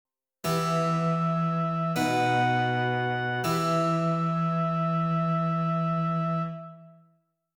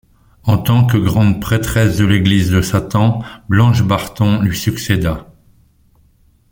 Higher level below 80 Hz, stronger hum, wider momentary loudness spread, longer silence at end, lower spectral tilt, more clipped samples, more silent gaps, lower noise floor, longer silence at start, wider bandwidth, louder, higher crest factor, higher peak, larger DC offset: second, -62 dBFS vs -36 dBFS; neither; about the same, 4 LU vs 5 LU; second, 0.65 s vs 1.3 s; about the same, -6.5 dB/octave vs -6.5 dB/octave; neither; neither; first, -68 dBFS vs -52 dBFS; about the same, 0.45 s vs 0.45 s; about the same, 18.5 kHz vs 17 kHz; second, -27 LUFS vs -14 LUFS; about the same, 12 dB vs 14 dB; second, -14 dBFS vs 0 dBFS; neither